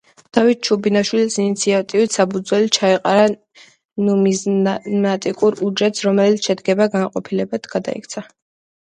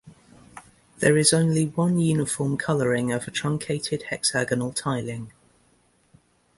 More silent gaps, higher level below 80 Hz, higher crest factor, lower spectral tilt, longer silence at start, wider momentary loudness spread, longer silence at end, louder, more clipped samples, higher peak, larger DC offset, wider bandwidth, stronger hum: first, 3.85-3.89 s vs none; second, -64 dBFS vs -58 dBFS; about the same, 18 dB vs 20 dB; about the same, -4.5 dB/octave vs -4.5 dB/octave; first, 0.35 s vs 0.05 s; about the same, 8 LU vs 10 LU; second, 0.6 s vs 1.3 s; first, -17 LUFS vs -23 LUFS; neither; first, 0 dBFS vs -4 dBFS; neither; about the same, 10.5 kHz vs 11.5 kHz; neither